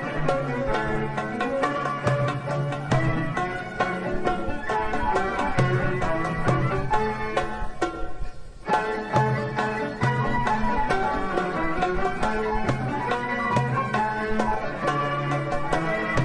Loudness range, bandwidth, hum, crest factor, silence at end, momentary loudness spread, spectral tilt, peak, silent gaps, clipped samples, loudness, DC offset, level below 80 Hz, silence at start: 1 LU; 10.5 kHz; none; 18 dB; 0 s; 4 LU; -6.5 dB/octave; -6 dBFS; none; under 0.1%; -25 LUFS; under 0.1%; -38 dBFS; 0 s